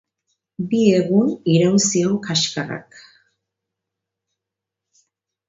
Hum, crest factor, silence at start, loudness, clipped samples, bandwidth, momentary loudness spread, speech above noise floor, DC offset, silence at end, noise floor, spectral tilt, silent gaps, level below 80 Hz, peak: none; 20 dB; 0.6 s; -18 LUFS; under 0.1%; 7.8 kHz; 13 LU; 67 dB; under 0.1%; 2.65 s; -84 dBFS; -4.5 dB/octave; none; -64 dBFS; -2 dBFS